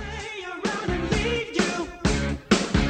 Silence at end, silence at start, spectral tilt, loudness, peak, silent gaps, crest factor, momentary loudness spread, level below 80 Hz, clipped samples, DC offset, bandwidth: 0 s; 0 s; -4.5 dB/octave; -26 LUFS; -6 dBFS; none; 20 dB; 8 LU; -34 dBFS; under 0.1%; under 0.1%; 10.5 kHz